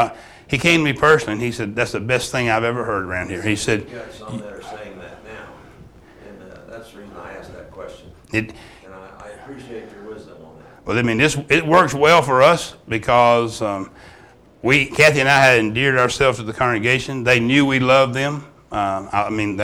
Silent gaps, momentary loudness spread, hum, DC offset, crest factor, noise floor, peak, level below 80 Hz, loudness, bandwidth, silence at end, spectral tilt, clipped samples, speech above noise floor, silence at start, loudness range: none; 24 LU; none; under 0.1%; 18 dB; -47 dBFS; -2 dBFS; -46 dBFS; -17 LUFS; 18 kHz; 0 s; -4.5 dB/octave; under 0.1%; 30 dB; 0 s; 16 LU